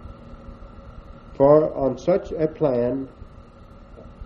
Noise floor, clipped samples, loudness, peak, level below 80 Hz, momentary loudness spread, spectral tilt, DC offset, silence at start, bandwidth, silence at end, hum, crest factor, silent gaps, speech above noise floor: -45 dBFS; under 0.1%; -21 LUFS; -4 dBFS; -44 dBFS; 27 LU; -9 dB/octave; under 0.1%; 0 s; 7 kHz; 0 s; none; 20 dB; none; 25 dB